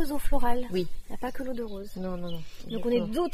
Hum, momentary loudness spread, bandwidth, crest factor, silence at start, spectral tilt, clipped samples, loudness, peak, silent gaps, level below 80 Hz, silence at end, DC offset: none; 10 LU; 14.5 kHz; 16 dB; 0 s; -6 dB/octave; under 0.1%; -32 LUFS; -10 dBFS; none; -36 dBFS; 0 s; under 0.1%